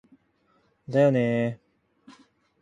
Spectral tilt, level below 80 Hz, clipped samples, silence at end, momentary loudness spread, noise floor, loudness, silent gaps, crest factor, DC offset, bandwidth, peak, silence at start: -8.5 dB/octave; -68 dBFS; under 0.1%; 0.5 s; 11 LU; -67 dBFS; -24 LUFS; none; 18 dB; under 0.1%; 9.6 kHz; -10 dBFS; 0.9 s